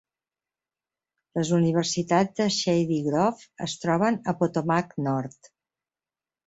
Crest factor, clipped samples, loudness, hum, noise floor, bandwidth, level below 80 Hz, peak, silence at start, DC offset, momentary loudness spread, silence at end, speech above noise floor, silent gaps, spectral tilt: 18 dB; under 0.1%; -25 LUFS; none; under -90 dBFS; 8.2 kHz; -64 dBFS; -8 dBFS; 1.35 s; under 0.1%; 8 LU; 1.2 s; over 65 dB; none; -5.5 dB/octave